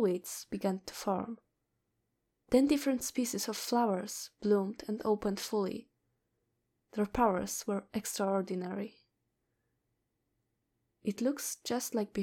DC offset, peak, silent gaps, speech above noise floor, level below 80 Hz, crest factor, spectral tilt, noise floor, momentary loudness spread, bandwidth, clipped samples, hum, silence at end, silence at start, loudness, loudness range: under 0.1%; -14 dBFS; none; 49 dB; -62 dBFS; 22 dB; -4.5 dB/octave; -82 dBFS; 10 LU; 18 kHz; under 0.1%; none; 0 s; 0 s; -34 LUFS; 7 LU